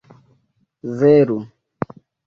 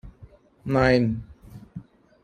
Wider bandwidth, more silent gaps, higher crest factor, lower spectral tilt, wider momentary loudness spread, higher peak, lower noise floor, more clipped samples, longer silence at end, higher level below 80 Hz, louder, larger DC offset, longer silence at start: second, 6.6 kHz vs 10 kHz; neither; about the same, 18 dB vs 22 dB; first, -9.5 dB/octave vs -7.5 dB/octave; second, 20 LU vs 24 LU; about the same, -2 dBFS vs -4 dBFS; first, -64 dBFS vs -51 dBFS; neither; first, 0.8 s vs 0.4 s; second, -60 dBFS vs -46 dBFS; first, -16 LUFS vs -22 LUFS; neither; first, 0.85 s vs 0.05 s